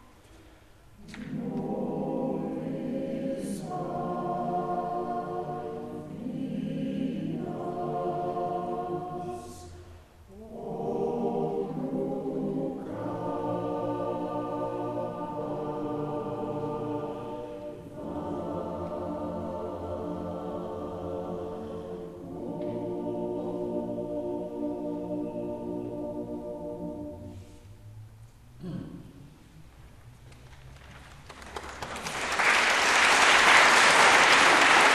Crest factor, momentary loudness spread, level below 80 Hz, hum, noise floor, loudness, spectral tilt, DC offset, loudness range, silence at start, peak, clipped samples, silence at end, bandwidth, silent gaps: 24 dB; 21 LU; -56 dBFS; none; -54 dBFS; -28 LUFS; -3 dB/octave; under 0.1%; 15 LU; 0.3 s; -6 dBFS; under 0.1%; 0 s; 14 kHz; none